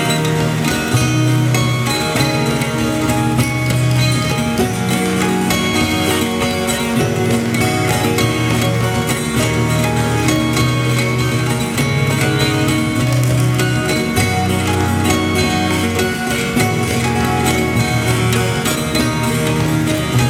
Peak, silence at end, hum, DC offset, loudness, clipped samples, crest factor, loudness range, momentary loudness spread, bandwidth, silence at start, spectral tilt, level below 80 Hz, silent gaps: 0 dBFS; 0 s; none; under 0.1%; -15 LUFS; under 0.1%; 14 dB; 0 LU; 2 LU; 17 kHz; 0 s; -5 dB/octave; -36 dBFS; none